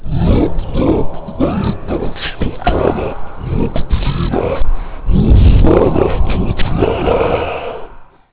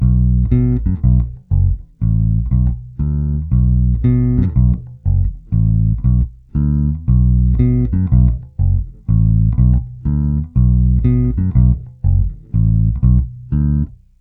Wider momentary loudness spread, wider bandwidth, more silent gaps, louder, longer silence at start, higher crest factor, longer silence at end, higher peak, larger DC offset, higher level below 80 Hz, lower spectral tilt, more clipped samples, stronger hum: first, 12 LU vs 6 LU; first, 4 kHz vs 2.2 kHz; neither; about the same, -15 LUFS vs -16 LUFS; about the same, 0 s vs 0 s; about the same, 10 dB vs 14 dB; about the same, 0.3 s vs 0.3 s; about the same, -2 dBFS vs 0 dBFS; neither; about the same, -18 dBFS vs -18 dBFS; second, -11.5 dB/octave vs -14 dB/octave; neither; neither